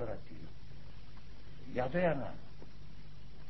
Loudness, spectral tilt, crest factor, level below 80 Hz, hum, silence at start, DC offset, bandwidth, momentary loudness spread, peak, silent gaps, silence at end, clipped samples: -37 LUFS; -6 dB/octave; 20 dB; -56 dBFS; 50 Hz at -55 dBFS; 0 s; 1%; 6 kHz; 22 LU; -20 dBFS; none; 0 s; under 0.1%